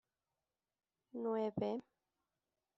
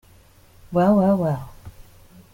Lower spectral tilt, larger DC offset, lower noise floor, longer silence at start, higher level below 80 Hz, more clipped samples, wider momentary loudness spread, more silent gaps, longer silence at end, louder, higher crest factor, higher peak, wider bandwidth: second, -7 dB/octave vs -9.5 dB/octave; neither; first, under -90 dBFS vs -51 dBFS; first, 1.15 s vs 0.7 s; second, -78 dBFS vs -50 dBFS; neither; second, 9 LU vs 14 LU; neither; first, 0.95 s vs 0.5 s; second, -41 LUFS vs -20 LUFS; about the same, 20 dB vs 16 dB; second, -26 dBFS vs -6 dBFS; second, 7.6 kHz vs 16.5 kHz